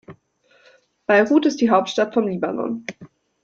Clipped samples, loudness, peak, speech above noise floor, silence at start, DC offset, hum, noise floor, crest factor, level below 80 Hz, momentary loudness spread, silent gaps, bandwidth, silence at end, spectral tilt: under 0.1%; -19 LUFS; -2 dBFS; 41 dB; 0.1 s; under 0.1%; none; -59 dBFS; 20 dB; -66 dBFS; 15 LU; none; 7.8 kHz; 0.4 s; -5.5 dB/octave